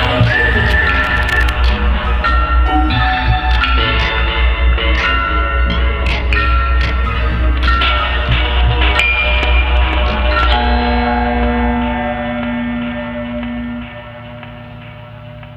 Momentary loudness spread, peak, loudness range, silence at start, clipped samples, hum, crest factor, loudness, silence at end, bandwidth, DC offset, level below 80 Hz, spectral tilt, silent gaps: 13 LU; 0 dBFS; 6 LU; 0 s; under 0.1%; none; 14 dB; -14 LUFS; 0 s; 7.8 kHz; under 0.1%; -16 dBFS; -6.5 dB/octave; none